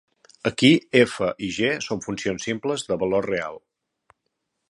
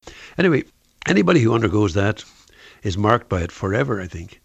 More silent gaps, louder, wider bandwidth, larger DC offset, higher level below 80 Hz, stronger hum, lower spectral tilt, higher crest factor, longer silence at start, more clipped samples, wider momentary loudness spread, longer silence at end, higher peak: neither; second, -23 LUFS vs -20 LUFS; first, 11.5 kHz vs 8.4 kHz; neither; second, -58 dBFS vs -44 dBFS; neither; second, -4.5 dB/octave vs -6.5 dB/octave; about the same, 22 dB vs 20 dB; first, 0.45 s vs 0.05 s; neither; second, 11 LU vs 14 LU; first, 1.1 s vs 0.15 s; about the same, -2 dBFS vs 0 dBFS